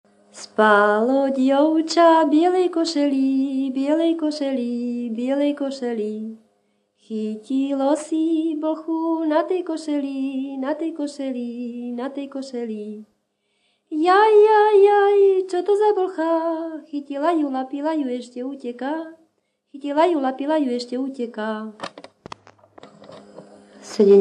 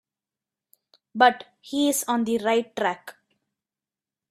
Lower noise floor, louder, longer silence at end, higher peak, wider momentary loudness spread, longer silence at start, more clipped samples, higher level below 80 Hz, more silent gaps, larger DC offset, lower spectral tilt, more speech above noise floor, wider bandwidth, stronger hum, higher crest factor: second, -70 dBFS vs under -90 dBFS; first, -20 LUFS vs -23 LUFS; second, 0 s vs 1.2 s; about the same, -2 dBFS vs -4 dBFS; about the same, 16 LU vs 17 LU; second, 0.35 s vs 1.15 s; neither; second, -78 dBFS vs -72 dBFS; neither; neither; first, -5 dB/octave vs -2.5 dB/octave; second, 50 dB vs over 67 dB; second, 10 kHz vs 15.5 kHz; neither; second, 18 dB vs 24 dB